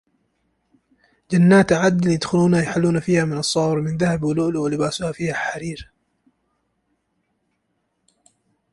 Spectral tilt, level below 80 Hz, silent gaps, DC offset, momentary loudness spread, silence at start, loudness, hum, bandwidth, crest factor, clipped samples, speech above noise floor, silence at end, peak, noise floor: -6 dB/octave; -52 dBFS; none; under 0.1%; 10 LU; 1.3 s; -19 LUFS; none; 11.5 kHz; 18 dB; under 0.1%; 53 dB; 2.9 s; -4 dBFS; -72 dBFS